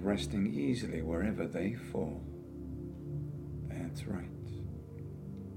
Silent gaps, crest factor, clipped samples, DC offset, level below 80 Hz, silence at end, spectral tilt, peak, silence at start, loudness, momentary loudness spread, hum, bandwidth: none; 18 dB; under 0.1%; under 0.1%; -52 dBFS; 0 s; -7 dB/octave; -18 dBFS; 0 s; -38 LUFS; 12 LU; none; 16 kHz